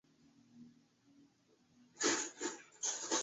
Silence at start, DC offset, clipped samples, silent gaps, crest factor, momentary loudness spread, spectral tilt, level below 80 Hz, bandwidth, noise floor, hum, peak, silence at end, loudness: 0.55 s; under 0.1%; under 0.1%; none; 22 dB; 9 LU; 0 dB/octave; -88 dBFS; 8.2 kHz; -72 dBFS; none; -22 dBFS; 0 s; -38 LUFS